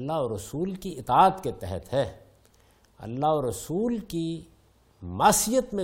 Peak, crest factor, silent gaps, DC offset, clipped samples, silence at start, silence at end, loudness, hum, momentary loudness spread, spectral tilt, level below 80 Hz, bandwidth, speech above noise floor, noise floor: -6 dBFS; 20 dB; none; under 0.1%; under 0.1%; 0 s; 0 s; -26 LUFS; none; 16 LU; -4.5 dB/octave; -52 dBFS; 16.5 kHz; 34 dB; -60 dBFS